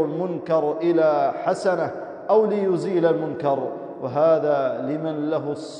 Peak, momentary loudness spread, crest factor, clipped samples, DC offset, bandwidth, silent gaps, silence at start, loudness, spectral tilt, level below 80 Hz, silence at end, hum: -8 dBFS; 8 LU; 14 dB; under 0.1%; under 0.1%; 10 kHz; none; 0 s; -22 LUFS; -7.5 dB/octave; -74 dBFS; 0 s; none